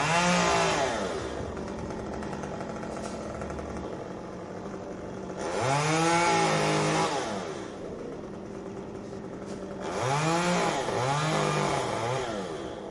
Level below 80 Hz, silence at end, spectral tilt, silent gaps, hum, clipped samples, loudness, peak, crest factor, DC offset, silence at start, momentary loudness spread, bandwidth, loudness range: -52 dBFS; 0 s; -4 dB/octave; none; none; under 0.1%; -29 LUFS; -12 dBFS; 18 dB; under 0.1%; 0 s; 15 LU; 11.5 kHz; 9 LU